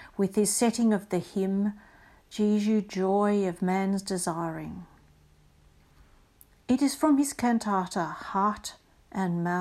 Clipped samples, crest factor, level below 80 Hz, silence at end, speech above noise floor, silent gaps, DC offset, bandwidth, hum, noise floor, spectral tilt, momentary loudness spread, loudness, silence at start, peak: under 0.1%; 16 dB; -60 dBFS; 0 s; 33 dB; none; under 0.1%; 14.5 kHz; none; -60 dBFS; -5.5 dB/octave; 14 LU; -27 LUFS; 0 s; -12 dBFS